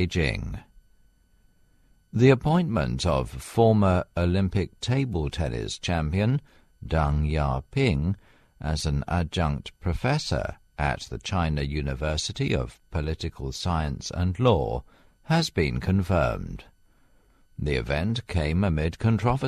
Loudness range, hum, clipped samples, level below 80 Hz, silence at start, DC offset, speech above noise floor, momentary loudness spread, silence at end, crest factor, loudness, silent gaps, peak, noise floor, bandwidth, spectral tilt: 5 LU; none; under 0.1%; -36 dBFS; 0 s; under 0.1%; 36 dB; 10 LU; 0 s; 22 dB; -26 LUFS; none; -4 dBFS; -61 dBFS; 13.5 kHz; -6.5 dB/octave